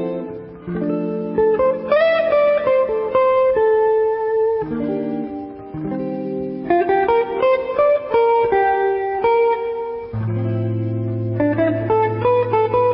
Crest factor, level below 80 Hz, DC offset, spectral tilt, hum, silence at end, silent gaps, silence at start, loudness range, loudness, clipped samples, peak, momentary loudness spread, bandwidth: 14 dB; -50 dBFS; under 0.1%; -12 dB/octave; none; 0 s; none; 0 s; 4 LU; -18 LUFS; under 0.1%; -4 dBFS; 10 LU; 5.6 kHz